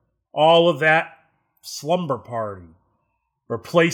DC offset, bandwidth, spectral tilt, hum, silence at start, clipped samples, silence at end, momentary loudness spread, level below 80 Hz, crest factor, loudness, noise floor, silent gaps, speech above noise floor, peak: under 0.1%; 18 kHz; -5 dB/octave; none; 0.35 s; under 0.1%; 0 s; 20 LU; -68 dBFS; 18 dB; -19 LUFS; -73 dBFS; none; 54 dB; -4 dBFS